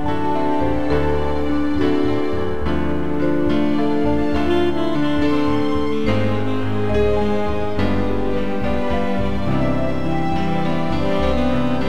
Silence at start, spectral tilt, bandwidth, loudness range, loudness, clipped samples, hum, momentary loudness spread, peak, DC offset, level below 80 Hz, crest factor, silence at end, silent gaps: 0 s; -7.5 dB/octave; 10.5 kHz; 2 LU; -20 LUFS; under 0.1%; none; 3 LU; -4 dBFS; 9%; -32 dBFS; 14 dB; 0 s; none